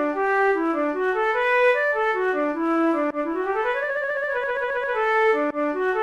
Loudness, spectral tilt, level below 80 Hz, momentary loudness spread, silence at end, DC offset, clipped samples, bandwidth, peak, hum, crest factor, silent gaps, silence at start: -22 LUFS; -4.5 dB/octave; -58 dBFS; 5 LU; 0 s; 0.1%; under 0.1%; 12 kHz; -10 dBFS; none; 14 dB; none; 0 s